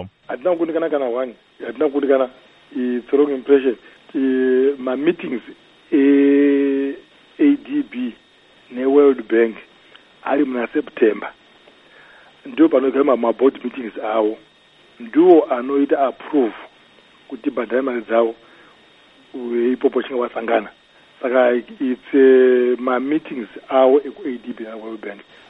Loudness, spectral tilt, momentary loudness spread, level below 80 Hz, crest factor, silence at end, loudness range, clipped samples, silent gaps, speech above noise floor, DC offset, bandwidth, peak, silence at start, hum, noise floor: -18 LUFS; -8 dB/octave; 17 LU; -66 dBFS; 18 dB; 0.3 s; 5 LU; under 0.1%; none; 34 dB; under 0.1%; 4 kHz; 0 dBFS; 0 s; none; -51 dBFS